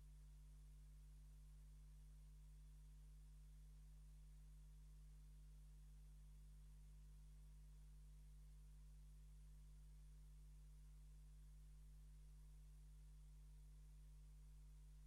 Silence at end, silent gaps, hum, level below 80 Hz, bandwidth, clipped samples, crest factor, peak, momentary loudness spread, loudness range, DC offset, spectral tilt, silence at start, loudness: 0 s; none; 50 Hz at -65 dBFS; -62 dBFS; 12.5 kHz; under 0.1%; 6 dB; -56 dBFS; 0 LU; 0 LU; under 0.1%; -5.5 dB/octave; 0 s; -67 LUFS